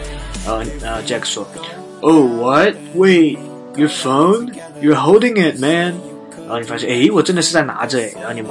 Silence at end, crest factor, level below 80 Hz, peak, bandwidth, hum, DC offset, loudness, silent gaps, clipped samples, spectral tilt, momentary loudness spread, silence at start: 0 s; 16 dB; -38 dBFS; 0 dBFS; 11.5 kHz; none; under 0.1%; -15 LUFS; none; under 0.1%; -4.5 dB/octave; 17 LU; 0 s